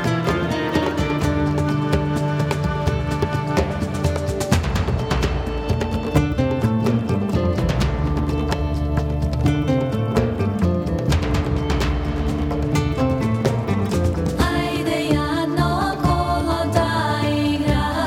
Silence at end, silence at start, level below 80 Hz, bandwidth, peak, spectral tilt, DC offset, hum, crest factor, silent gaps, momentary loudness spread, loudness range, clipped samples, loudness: 0 s; 0 s; -28 dBFS; 16.5 kHz; -2 dBFS; -6.5 dB/octave; under 0.1%; none; 18 dB; none; 3 LU; 1 LU; under 0.1%; -21 LUFS